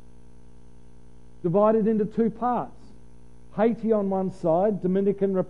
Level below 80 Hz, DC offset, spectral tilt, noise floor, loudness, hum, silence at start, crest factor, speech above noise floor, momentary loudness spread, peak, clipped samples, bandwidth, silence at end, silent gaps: -54 dBFS; 0.8%; -10 dB/octave; -52 dBFS; -24 LUFS; 60 Hz at -50 dBFS; 1.45 s; 16 dB; 29 dB; 8 LU; -8 dBFS; under 0.1%; 6.8 kHz; 0 s; none